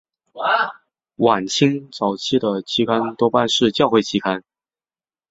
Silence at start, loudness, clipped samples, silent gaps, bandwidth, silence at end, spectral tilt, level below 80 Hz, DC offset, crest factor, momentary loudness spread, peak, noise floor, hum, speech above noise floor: 0.35 s; -19 LUFS; under 0.1%; none; 8.2 kHz; 0.9 s; -4.5 dB/octave; -60 dBFS; under 0.1%; 18 dB; 7 LU; -2 dBFS; under -90 dBFS; none; over 72 dB